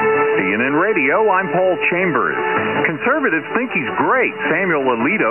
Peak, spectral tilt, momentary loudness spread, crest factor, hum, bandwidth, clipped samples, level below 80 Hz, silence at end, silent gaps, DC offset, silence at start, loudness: -2 dBFS; -8.5 dB/octave; 3 LU; 14 dB; none; 3.2 kHz; under 0.1%; -66 dBFS; 0 s; none; 0.2%; 0 s; -16 LUFS